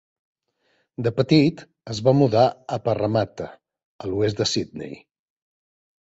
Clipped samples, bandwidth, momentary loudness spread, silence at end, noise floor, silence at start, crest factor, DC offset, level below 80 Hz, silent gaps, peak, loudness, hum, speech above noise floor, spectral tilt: under 0.1%; 8 kHz; 18 LU; 1.15 s; -68 dBFS; 1 s; 20 dB; under 0.1%; -56 dBFS; 3.85-3.99 s; -4 dBFS; -21 LUFS; none; 47 dB; -6 dB/octave